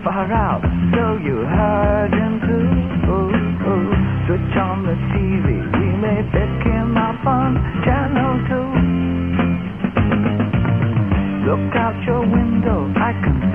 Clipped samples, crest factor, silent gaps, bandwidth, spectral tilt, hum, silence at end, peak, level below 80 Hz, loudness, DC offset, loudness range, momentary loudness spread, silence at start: under 0.1%; 14 dB; none; 3.6 kHz; -10.5 dB/octave; none; 0 s; -2 dBFS; -28 dBFS; -18 LUFS; 0.4%; 1 LU; 2 LU; 0 s